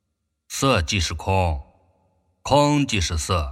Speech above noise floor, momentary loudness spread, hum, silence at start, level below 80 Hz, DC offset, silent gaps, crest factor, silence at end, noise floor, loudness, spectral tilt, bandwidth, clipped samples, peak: 53 dB; 12 LU; none; 0.5 s; -34 dBFS; under 0.1%; none; 20 dB; 0 s; -74 dBFS; -21 LUFS; -4.5 dB/octave; 16 kHz; under 0.1%; -4 dBFS